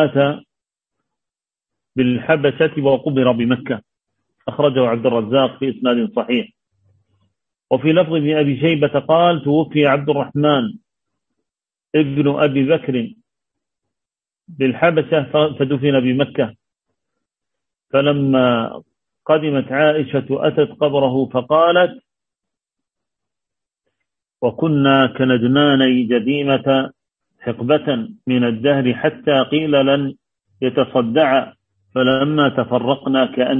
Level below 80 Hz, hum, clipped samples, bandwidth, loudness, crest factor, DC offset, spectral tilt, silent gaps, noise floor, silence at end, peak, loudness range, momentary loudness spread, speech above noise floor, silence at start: -60 dBFS; none; under 0.1%; 3.9 kHz; -17 LUFS; 16 dB; under 0.1%; -9.5 dB/octave; none; -86 dBFS; 0 s; -2 dBFS; 4 LU; 8 LU; 71 dB; 0 s